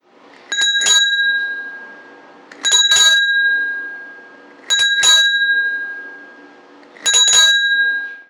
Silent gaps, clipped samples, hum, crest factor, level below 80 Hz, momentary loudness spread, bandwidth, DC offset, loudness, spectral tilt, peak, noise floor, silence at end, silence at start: none; under 0.1%; none; 14 dB; -64 dBFS; 18 LU; 19 kHz; under 0.1%; -12 LUFS; 4 dB/octave; -2 dBFS; -45 dBFS; 0.1 s; 0.5 s